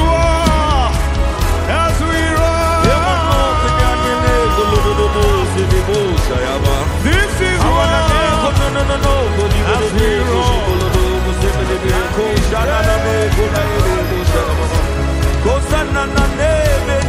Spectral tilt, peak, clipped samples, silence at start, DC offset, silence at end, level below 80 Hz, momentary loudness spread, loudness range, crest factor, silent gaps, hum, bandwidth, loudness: -5.5 dB/octave; -2 dBFS; under 0.1%; 0 s; under 0.1%; 0 s; -18 dBFS; 3 LU; 2 LU; 12 dB; none; none; 16 kHz; -14 LUFS